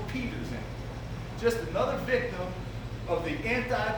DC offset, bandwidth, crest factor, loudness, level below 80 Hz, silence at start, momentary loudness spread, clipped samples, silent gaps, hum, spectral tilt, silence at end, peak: under 0.1%; over 20 kHz; 20 dB; -32 LUFS; -44 dBFS; 0 s; 10 LU; under 0.1%; none; none; -6 dB/octave; 0 s; -12 dBFS